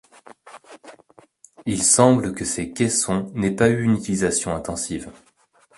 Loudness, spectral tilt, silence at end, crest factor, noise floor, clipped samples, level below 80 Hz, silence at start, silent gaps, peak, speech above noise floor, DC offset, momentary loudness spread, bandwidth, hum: -20 LUFS; -4.5 dB/octave; 0.65 s; 22 dB; -59 dBFS; under 0.1%; -48 dBFS; 0.3 s; none; 0 dBFS; 39 dB; under 0.1%; 13 LU; 11.5 kHz; none